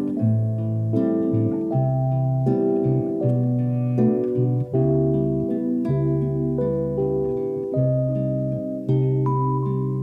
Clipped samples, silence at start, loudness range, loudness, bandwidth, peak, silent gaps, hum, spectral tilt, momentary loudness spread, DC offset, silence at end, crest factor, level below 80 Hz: under 0.1%; 0 s; 2 LU; -22 LUFS; 2.6 kHz; -8 dBFS; none; none; -12.5 dB/octave; 4 LU; under 0.1%; 0 s; 12 dB; -48 dBFS